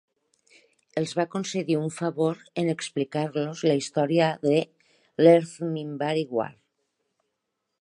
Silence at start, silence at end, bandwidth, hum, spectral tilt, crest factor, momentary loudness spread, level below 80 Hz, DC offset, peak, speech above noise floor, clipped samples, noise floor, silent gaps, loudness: 0.95 s; 1.3 s; 11 kHz; none; -6 dB/octave; 22 dB; 11 LU; -76 dBFS; under 0.1%; -6 dBFS; 56 dB; under 0.1%; -81 dBFS; none; -25 LUFS